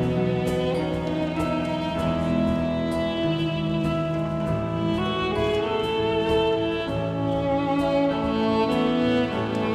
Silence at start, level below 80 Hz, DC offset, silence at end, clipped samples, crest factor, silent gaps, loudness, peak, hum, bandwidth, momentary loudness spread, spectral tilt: 0 s; -42 dBFS; under 0.1%; 0 s; under 0.1%; 12 dB; none; -24 LUFS; -10 dBFS; none; 13.5 kHz; 4 LU; -7 dB/octave